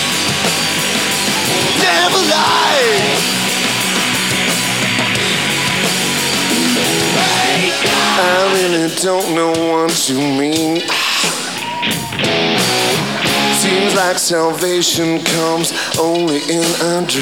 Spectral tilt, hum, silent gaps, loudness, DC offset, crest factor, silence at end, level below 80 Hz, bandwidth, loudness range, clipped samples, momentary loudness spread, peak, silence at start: -2.5 dB/octave; none; none; -13 LUFS; 0.3%; 14 dB; 0 s; -54 dBFS; 18 kHz; 2 LU; under 0.1%; 4 LU; 0 dBFS; 0 s